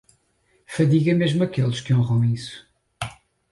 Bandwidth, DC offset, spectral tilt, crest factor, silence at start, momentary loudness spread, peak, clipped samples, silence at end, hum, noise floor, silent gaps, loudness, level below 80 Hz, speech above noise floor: 11.5 kHz; under 0.1%; -7 dB/octave; 14 dB; 0.7 s; 15 LU; -8 dBFS; under 0.1%; 0.4 s; none; -65 dBFS; none; -21 LUFS; -54 dBFS; 45 dB